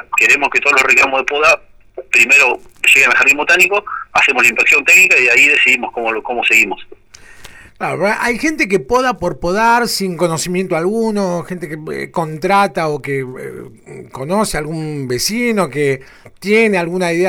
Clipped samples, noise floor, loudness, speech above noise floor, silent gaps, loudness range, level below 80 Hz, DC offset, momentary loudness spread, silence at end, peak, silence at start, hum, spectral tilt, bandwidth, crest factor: under 0.1%; -38 dBFS; -12 LUFS; 24 dB; none; 10 LU; -44 dBFS; under 0.1%; 15 LU; 0 s; -2 dBFS; 0.1 s; none; -3.5 dB/octave; over 20 kHz; 12 dB